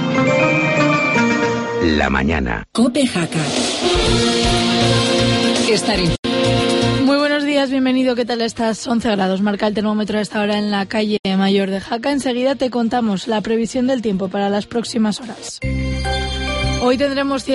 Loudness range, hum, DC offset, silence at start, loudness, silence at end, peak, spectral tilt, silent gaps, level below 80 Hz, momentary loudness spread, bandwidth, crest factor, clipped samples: 4 LU; none; under 0.1%; 0 s; -17 LUFS; 0 s; -4 dBFS; -5 dB/octave; 6.19-6.23 s, 11.19-11.23 s; -32 dBFS; 6 LU; 11.5 kHz; 14 dB; under 0.1%